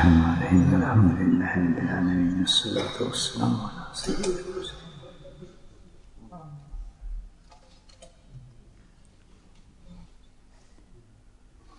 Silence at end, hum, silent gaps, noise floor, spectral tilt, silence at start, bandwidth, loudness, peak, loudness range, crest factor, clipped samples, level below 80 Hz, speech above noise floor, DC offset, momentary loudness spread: 1.75 s; none; none; -54 dBFS; -5.5 dB/octave; 0 s; 11 kHz; -24 LUFS; -6 dBFS; 25 LU; 22 dB; under 0.1%; -44 dBFS; 32 dB; under 0.1%; 25 LU